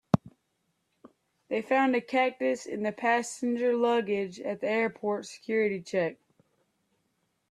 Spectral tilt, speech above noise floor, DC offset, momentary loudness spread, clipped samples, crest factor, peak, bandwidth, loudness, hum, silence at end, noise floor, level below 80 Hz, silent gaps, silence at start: -5.5 dB/octave; 49 dB; under 0.1%; 8 LU; under 0.1%; 24 dB; -6 dBFS; 12.5 kHz; -29 LUFS; none; 1.35 s; -77 dBFS; -70 dBFS; none; 0.15 s